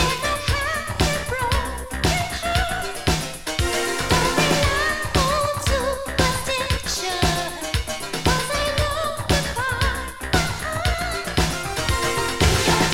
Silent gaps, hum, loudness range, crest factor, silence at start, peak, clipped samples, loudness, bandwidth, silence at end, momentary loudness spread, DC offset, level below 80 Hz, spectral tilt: none; none; 2 LU; 18 dB; 0 s; -4 dBFS; under 0.1%; -22 LUFS; 17 kHz; 0 s; 6 LU; under 0.1%; -30 dBFS; -3.5 dB/octave